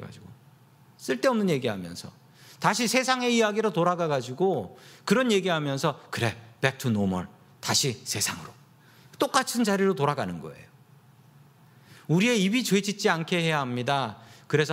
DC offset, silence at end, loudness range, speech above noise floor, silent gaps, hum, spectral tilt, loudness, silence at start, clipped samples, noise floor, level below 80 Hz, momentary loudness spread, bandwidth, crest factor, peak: under 0.1%; 0 s; 3 LU; 30 dB; none; none; -4.5 dB/octave; -26 LUFS; 0 s; under 0.1%; -56 dBFS; -68 dBFS; 15 LU; 16 kHz; 22 dB; -6 dBFS